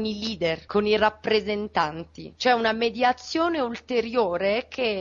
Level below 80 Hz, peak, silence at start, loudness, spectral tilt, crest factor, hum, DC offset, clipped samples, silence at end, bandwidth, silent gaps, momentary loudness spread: -54 dBFS; -8 dBFS; 0 s; -24 LUFS; -4.5 dB/octave; 16 dB; none; under 0.1%; under 0.1%; 0 s; 7.4 kHz; none; 6 LU